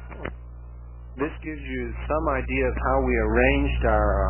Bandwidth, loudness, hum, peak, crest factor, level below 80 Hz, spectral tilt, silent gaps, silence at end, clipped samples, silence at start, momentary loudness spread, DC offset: 3.2 kHz; -24 LUFS; 60 Hz at -30 dBFS; -6 dBFS; 18 dB; -30 dBFS; -10.5 dB/octave; none; 0 s; under 0.1%; 0 s; 22 LU; 0.1%